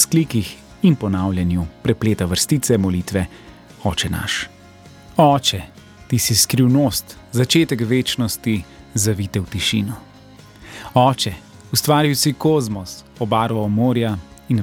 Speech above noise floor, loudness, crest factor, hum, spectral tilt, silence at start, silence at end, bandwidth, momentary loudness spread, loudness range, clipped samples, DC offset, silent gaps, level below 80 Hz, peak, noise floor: 25 dB; -19 LUFS; 18 dB; none; -4.5 dB/octave; 0 s; 0 s; 17.5 kHz; 12 LU; 4 LU; under 0.1%; under 0.1%; none; -44 dBFS; -2 dBFS; -43 dBFS